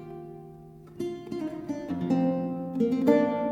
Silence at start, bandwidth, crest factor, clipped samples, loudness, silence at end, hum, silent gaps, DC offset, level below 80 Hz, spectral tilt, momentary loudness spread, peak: 0 s; 14.5 kHz; 20 dB; under 0.1%; -28 LUFS; 0 s; none; none; under 0.1%; -62 dBFS; -8.5 dB/octave; 23 LU; -8 dBFS